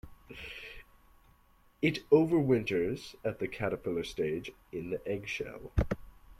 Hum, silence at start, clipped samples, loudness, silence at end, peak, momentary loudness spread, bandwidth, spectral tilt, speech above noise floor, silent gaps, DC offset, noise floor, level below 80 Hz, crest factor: none; 0.05 s; under 0.1%; -33 LUFS; 0.05 s; -12 dBFS; 18 LU; 13.5 kHz; -7 dB/octave; 33 dB; none; under 0.1%; -64 dBFS; -48 dBFS; 22 dB